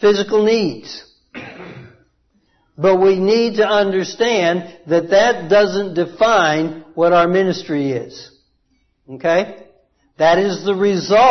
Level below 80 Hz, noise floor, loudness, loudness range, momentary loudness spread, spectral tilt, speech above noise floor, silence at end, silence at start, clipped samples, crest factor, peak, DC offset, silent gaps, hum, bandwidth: -54 dBFS; -63 dBFS; -16 LUFS; 4 LU; 20 LU; -5 dB/octave; 48 dB; 0 s; 0 s; under 0.1%; 14 dB; -2 dBFS; under 0.1%; none; none; 6.4 kHz